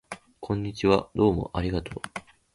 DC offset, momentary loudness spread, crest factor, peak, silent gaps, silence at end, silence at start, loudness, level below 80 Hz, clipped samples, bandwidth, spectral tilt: under 0.1%; 17 LU; 22 dB; -6 dBFS; none; 0.35 s; 0.1 s; -27 LUFS; -44 dBFS; under 0.1%; 11.5 kHz; -7 dB/octave